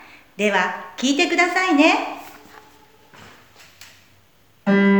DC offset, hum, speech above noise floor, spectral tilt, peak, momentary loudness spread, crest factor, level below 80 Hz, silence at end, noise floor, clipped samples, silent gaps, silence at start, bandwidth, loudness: 0.1%; none; 38 dB; -4.5 dB/octave; -4 dBFS; 14 LU; 18 dB; -68 dBFS; 0 s; -57 dBFS; under 0.1%; none; 0.4 s; 19.5 kHz; -19 LUFS